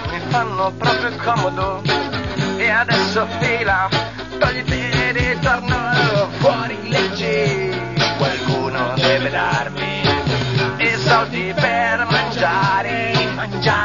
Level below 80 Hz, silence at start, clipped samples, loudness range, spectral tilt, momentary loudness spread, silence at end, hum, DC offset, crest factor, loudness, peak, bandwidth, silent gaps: -40 dBFS; 0 s; under 0.1%; 1 LU; -5 dB/octave; 5 LU; 0 s; none; 0.5%; 16 dB; -18 LUFS; -2 dBFS; 7.4 kHz; none